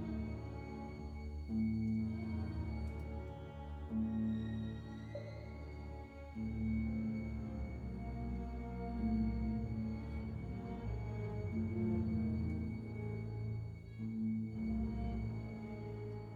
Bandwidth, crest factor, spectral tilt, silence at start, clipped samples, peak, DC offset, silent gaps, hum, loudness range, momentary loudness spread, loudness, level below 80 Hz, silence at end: 7 kHz; 14 dB; -9.5 dB/octave; 0 s; under 0.1%; -26 dBFS; under 0.1%; none; none; 3 LU; 10 LU; -42 LUFS; -48 dBFS; 0 s